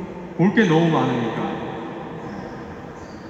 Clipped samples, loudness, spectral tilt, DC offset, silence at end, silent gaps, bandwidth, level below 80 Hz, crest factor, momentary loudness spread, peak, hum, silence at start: under 0.1%; -21 LUFS; -7 dB/octave; under 0.1%; 0 s; none; 7.8 kHz; -52 dBFS; 18 dB; 18 LU; -4 dBFS; none; 0 s